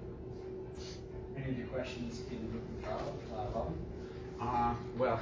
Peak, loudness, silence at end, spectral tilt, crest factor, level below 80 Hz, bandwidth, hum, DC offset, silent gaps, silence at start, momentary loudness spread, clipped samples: -22 dBFS; -40 LUFS; 0 s; -7 dB/octave; 18 dB; -50 dBFS; 7.6 kHz; none; under 0.1%; none; 0 s; 11 LU; under 0.1%